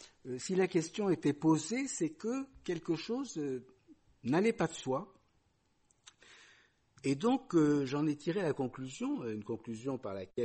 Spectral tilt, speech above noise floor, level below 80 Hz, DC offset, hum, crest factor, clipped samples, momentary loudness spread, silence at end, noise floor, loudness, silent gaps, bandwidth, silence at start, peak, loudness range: -5.5 dB/octave; 40 dB; -72 dBFS; under 0.1%; none; 16 dB; under 0.1%; 10 LU; 0 s; -74 dBFS; -35 LUFS; none; 8.4 kHz; 0 s; -18 dBFS; 4 LU